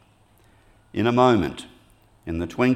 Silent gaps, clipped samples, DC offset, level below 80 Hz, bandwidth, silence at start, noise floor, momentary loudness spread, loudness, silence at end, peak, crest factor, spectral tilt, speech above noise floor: none; under 0.1%; under 0.1%; -52 dBFS; 14 kHz; 0.95 s; -57 dBFS; 19 LU; -22 LUFS; 0 s; -4 dBFS; 20 dB; -7 dB/octave; 36 dB